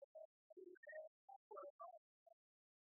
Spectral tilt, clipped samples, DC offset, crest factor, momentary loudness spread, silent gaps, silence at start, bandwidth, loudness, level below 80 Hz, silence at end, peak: 11.5 dB/octave; under 0.1%; under 0.1%; 18 dB; 7 LU; 0.04-0.15 s, 0.25-0.50 s, 0.77-0.83 s, 1.07-1.28 s, 1.36-1.51 s, 1.70-1.79 s, 1.98-2.26 s; 0 s; 1.9 kHz; -61 LUFS; under -90 dBFS; 0.55 s; -44 dBFS